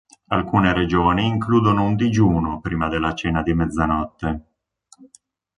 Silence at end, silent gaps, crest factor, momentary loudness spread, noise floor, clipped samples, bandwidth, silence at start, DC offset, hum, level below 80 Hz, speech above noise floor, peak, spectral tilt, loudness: 1.15 s; none; 18 dB; 7 LU; -56 dBFS; under 0.1%; 10.5 kHz; 0.3 s; under 0.1%; none; -36 dBFS; 37 dB; -2 dBFS; -7 dB/octave; -20 LUFS